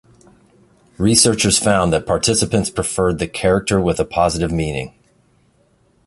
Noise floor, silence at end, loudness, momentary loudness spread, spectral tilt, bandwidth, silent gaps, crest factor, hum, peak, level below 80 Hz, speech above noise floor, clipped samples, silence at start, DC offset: -57 dBFS; 1.2 s; -16 LUFS; 8 LU; -4 dB/octave; 12 kHz; none; 18 dB; none; 0 dBFS; -36 dBFS; 41 dB; under 0.1%; 1 s; under 0.1%